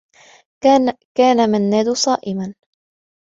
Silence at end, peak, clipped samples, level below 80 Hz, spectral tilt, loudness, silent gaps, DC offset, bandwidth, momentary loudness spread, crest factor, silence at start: 0.7 s; -2 dBFS; under 0.1%; -60 dBFS; -4.5 dB/octave; -16 LUFS; 1.05-1.15 s; under 0.1%; 7.8 kHz; 11 LU; 16 dB; 0.65 s